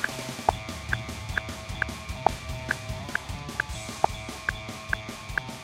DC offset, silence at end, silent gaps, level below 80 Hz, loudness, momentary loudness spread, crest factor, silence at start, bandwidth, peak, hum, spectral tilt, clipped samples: under 0.1%; 0 s; none; -42 dBFS; -31 LUFS; 4 LU; 26 dB; 0 s; 16 kHz; -6 dBFS; none; -4 dB/octave; under 0.1%